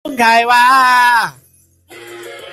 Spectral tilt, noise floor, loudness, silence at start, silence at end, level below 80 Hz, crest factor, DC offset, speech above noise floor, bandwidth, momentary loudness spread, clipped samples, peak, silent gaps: -1.5 dB/octave; -45 dBFS; -9 LUFS; 0.05 s; 0 s; -60 dBFS; 12 dB; under 0.1%; 35 dB; 16 kHz; 22 LU; under 0.1%; 0 dBFS; none